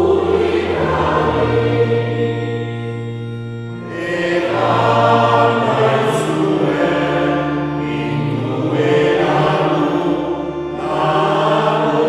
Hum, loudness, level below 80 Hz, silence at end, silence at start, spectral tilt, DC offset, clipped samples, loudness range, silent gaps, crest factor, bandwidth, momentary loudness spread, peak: none; -16 LUFS; -42 dBFS; 0 s; 0 s; -7 dB/octave; under 0.1%; under 0.1%; 4 LU; none; 16 dB; 12.5 kHz; 10 LU; 0 dBFS